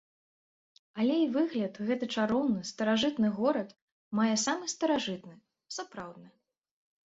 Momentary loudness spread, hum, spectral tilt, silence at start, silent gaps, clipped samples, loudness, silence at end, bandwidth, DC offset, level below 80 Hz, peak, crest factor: 15 LU; none; -4 dB/octave; 0.95 s; 3.82-4.11 s; under 0.1%; -30 LUFS; 0.75 s; 8 kHz; under 0.1%; -72 dBFS; -16 dBFS; 16 dB